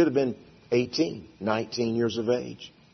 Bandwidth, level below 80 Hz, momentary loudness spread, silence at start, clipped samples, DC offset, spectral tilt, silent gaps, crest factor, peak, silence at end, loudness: 6.4 kHz; -66 dBFS; 12 LU; 0 s; under 0.1%; under 0.1%; -6 dB/octave; none; 16 dB; -10 dBFS; 0.25 s; -28 LUFS